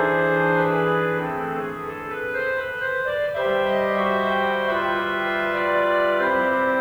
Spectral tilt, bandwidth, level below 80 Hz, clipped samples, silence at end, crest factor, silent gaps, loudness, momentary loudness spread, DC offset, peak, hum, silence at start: -6.5 dB/octave; over 20 kHz; -54 dBFS; under 0.1%; 0 s; 12 dB; none; -22 LUFS; 7 LU; under 0.1%; -10 dBFS; none; 0 s